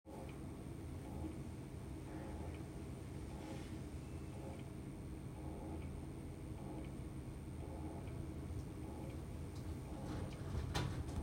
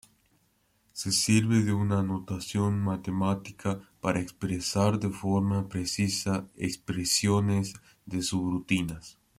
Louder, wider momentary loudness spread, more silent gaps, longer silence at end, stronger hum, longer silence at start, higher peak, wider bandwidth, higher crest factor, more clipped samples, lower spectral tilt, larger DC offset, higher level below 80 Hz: second, -48 LUFS vs -29 LUFS; second, 5 LU vs 10 LU; neither; second, 0 s vs 0.25 s; neither; second, 0.05 s vs 0.95 s; second, -28 dBFS vs -10 dBFS; about the same, 16 kHz vs 15.5 kHz; about the same, 20 dB vs 18 dB; neither; first, -6.5 dB/octave vs -5 dB/octave; neither; about the same, -54 dBFS vs -58 dBFS